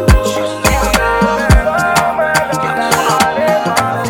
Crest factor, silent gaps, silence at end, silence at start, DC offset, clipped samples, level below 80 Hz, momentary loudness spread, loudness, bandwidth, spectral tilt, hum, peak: 12 dB; none; 0 s; 0 s; under 0.1%; 0.1%; -20 dBFS; 3 LU; -12 LUFS; 18.5 kHz; -4.5 dB/octave; none; 0 dBFS